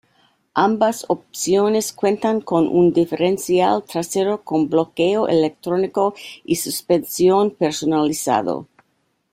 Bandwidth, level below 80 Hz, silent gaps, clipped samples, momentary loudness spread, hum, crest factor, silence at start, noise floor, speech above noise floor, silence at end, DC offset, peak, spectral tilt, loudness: 16 kHz; -60 dBFS; none; under 0.1%; 7 LU; none; 16 dB; 0.55 s; -68 dBFS; 49 dB; 0.7 s; under 0.1%; -4 dBFS; -5 dB/octave; -19 LUFS